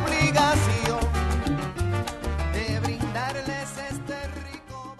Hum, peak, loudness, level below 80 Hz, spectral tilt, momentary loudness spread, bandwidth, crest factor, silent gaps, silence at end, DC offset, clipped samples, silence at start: none; -8 dBFS; -26 LUFS; -34 dBFS; -5 dB/octave; 13 LU; 13 kHz; 18 dB; none; 0 s; under 0.1%; under 0.1%; 0 s